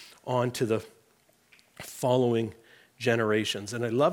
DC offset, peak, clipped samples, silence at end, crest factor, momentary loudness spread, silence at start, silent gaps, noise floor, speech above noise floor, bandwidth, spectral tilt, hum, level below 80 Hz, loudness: under 0.1%; -12 dBFS; under 0.1%; 0 s; 18 dB; 8 LU; 0 s; none; -65 dBFS; 38 dB; 18.5 kHz; -5.5 dB/octave; none; -72 dBFS; -28 LUFS